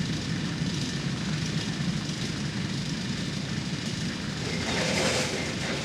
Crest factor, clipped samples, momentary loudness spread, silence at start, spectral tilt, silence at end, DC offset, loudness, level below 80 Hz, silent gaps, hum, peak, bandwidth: 16 dB; under 0.1%; 6 LU; 0 s; -4 dB/octave; 0 s; under 0.1%; -29 LUFS; -48 dBFS; none; none; -14 dBFS; 15 kHz